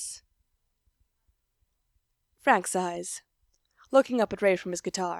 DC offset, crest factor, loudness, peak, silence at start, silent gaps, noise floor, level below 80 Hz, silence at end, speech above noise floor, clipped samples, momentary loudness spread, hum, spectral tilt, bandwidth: under 0.1%; 24 dB; -27 LUFS; -6 dBFS; 0 s; none; -75 dBFS; -68 dBFS; 0 s; 49 dB; under 0.1%; 14 LU; none; -3.5 dB/octave; 14.5 kHz